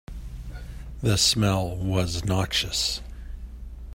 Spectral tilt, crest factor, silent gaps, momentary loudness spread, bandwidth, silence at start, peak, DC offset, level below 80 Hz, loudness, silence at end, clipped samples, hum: -4 dB/octave; 20 dB; none; 21 LU; 16.5 kHz; 0.1 s; -8 dBFS; under 0.1%; -38 dBFS; -24 LUFS; 0 s; under 0.1%; none